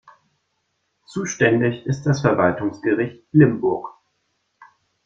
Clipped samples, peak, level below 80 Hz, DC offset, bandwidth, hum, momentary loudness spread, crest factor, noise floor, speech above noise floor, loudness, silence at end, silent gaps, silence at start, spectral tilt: under 0.1%; -2 dBFS; -56 dBFS; under 0.1%; 7.6 kHz; none; 13 LU; 20 dB; -72 dBFS; 53 dB; -20 LUFS; 1.15 s; none; 1.1 s; -6.5 dB/octave